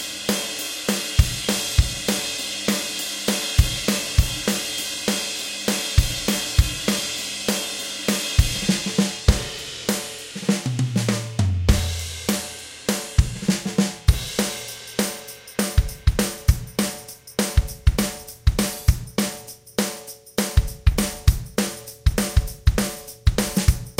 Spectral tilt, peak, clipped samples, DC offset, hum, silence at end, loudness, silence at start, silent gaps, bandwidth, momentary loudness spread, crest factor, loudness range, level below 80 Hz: -4 dB/octave; -2 dBFS; under 0.1%; under 0.1%; none; 0.05 s; -23 LUFS; 0 s; none; 17 kHz; 6 LU; 22 dB; 2 LU; -26 dBFS